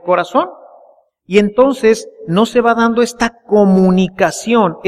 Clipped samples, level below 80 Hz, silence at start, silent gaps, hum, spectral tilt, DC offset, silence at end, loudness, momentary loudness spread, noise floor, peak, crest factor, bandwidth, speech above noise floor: under 0.1%; -46 dBFS; 0.05 s; none; none; -6 dB/octave; under 0.1%; 0 s; -13 LUFS; 7 LU; -48 dBFS; 0 dBFS; 12 dB; 13 kHz; 36 dB